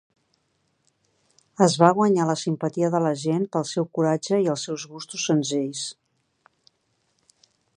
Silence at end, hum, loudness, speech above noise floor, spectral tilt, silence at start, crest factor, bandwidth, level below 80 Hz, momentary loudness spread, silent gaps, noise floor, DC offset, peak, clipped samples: 1.85 s; none; -23 LUFS; 48 dB; -5.5 dB/octave; 1.6 s; 24 dB; 10.5 kHz; -76 dBFS; 14 LU; none; -71 dBFS; under 0.1%; -2 dBFS; under 0.1%